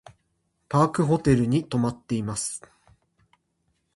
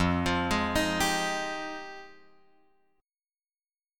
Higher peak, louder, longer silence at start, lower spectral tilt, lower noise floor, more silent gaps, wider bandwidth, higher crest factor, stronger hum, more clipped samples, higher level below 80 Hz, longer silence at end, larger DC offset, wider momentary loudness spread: first, -6 dBFS vs -14 dBFS; first, -24 LUFS vs -28 LUFS; first, 0.7 s vs 0 s; first, -6.5 dB/octave vs -4 dB/octave; second, -73 dBFS vs under -90 dBFS; neither; second, 11.5 kHz vs 17.5 kHz; about the same, 20 dB vs 18 dB; neither; neither; about the same, -52 dBFS vs -48 dBFS; first, 1.4 s vs 0 s; neither; second, 9 LU vs 15 LU